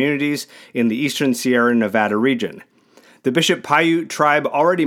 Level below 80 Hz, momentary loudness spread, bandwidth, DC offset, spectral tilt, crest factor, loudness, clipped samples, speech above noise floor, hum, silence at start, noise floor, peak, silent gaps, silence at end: -74 dBFS; 8 LU; 17.5 kHz; under 0.1%; -4.5 dB/octave; 18 dB; -18 LUFS; under 0.1%; 33 dB; none; 0 s; -51 dBFS; 0 dBFS; none; 0 s